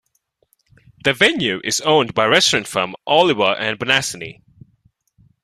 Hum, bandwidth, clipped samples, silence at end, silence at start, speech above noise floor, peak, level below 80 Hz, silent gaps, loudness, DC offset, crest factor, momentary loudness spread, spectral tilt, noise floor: none; 14 kHz; under 0.1%; 1.1 s; 1.05 s; 49 dB; 0 dBFS; -56 dBFS; none; -16 LUFS; under 0.1%; 18 dB; 9 LU; -2.5 dB/octave; -66 dBFS